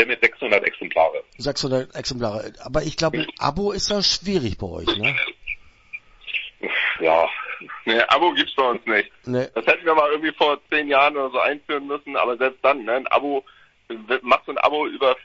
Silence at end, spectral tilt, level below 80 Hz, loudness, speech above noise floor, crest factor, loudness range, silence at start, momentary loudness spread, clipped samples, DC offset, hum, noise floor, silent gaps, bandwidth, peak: 0.05 s; -4 dB/octave; -48 dBFS; -21 LUFS; 20 dB; 22 dB; 4 LU; 0 s; 11 LU; under 0.1%; under 0.1%; none; -41 dBFS; none; 8 kHz; 0 dBFS